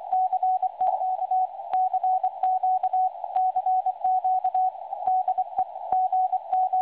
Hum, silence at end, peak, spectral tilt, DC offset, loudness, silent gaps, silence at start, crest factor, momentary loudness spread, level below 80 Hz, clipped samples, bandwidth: none; 0 s; -12 dBFS; -6 dB/octave; under 0.1%; -25 LUFS; none; 0 s; 12 dB; 3 LU; -74 dBFS; under 0.1%; 4 kHz